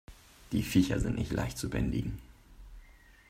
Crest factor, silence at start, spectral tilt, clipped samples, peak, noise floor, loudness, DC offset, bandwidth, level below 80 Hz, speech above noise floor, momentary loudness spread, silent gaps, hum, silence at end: 20 dB; 0.1 s; -6 dB/octave; under 0.1%; -12 dBFS; -57 dBFS; -32 LUFS; under 0.1%; 16 kHz; -44 dBFS; 26 dB; 9 LU; none; none; 0.35 s